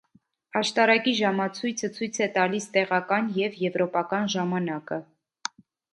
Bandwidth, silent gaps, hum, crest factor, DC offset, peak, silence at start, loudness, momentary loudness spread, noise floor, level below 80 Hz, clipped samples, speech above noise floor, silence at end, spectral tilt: 11.5 kHz; none; none; 20 dB; under 0.1%; -6 dBFS; 0.55 s; -25 LUFS; 14 LU; -64 dBFS; -74 dBFS; under 0.1%; 38 dB; 0.9 s; -4 dB/octave